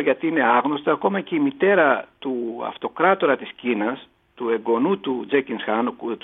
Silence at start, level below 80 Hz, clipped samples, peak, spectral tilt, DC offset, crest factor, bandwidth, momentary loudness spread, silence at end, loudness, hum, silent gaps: 0 s; -70 dBFS; under 0.1%; -4 dBFS; -9 dB/octave; under 0.1%; 18 dB; 3.9 kHz; 10 LU; 0.05 s; -22 LUFS; none; none